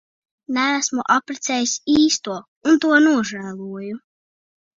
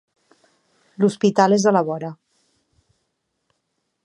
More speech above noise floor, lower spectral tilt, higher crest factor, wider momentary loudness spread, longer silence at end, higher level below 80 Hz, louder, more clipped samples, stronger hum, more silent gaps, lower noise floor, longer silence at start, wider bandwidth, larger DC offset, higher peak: first, over 71 dB vs 57 dB; second, -2.5 dB/octave vs -6 dB/octave; about the same, 18 dB vs 22 dB; first, 16 LU vs 13 LU; second, 0.8 s vs 1.9 s; first, -60 dBFS vs -72 dBFS; about the same, -18 LUFS vs -18 LUFS; neither; neither; first, 2.48-2.61 s vs none; first, under -90 dBFS vs -74 dBFS; second, 0.5 s vs 1 s; second, 7.8 kHz vs 11 kHz; neither; about the same, -2 dBFS vs -2 dBFS